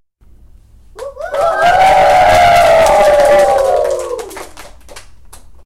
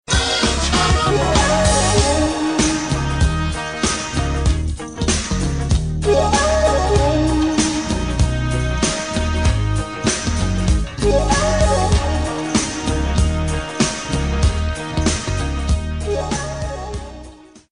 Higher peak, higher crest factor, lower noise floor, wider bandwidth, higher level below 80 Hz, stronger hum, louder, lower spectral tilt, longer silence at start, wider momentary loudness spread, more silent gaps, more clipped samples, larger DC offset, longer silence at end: about the same, -2 dBFS vs 0 dBFS; second, 10 dB vs 18 dB; about the same, -42 dBFS vs -40 dBFS; first, 16.5 kHz vs 10.5 kHz; second, -34 dBFS vs -22 dBFS; neither; first, -9 LUFS vs -18 LUFS; second, -3 dB/octave vs -4.5 dB/octave; first, 0.3 s vs 0.1 s; first, 19 LU vs 7 LU; neither; neither; first, 1% vs 0.3%; first, 0.65 s vs 0.15 s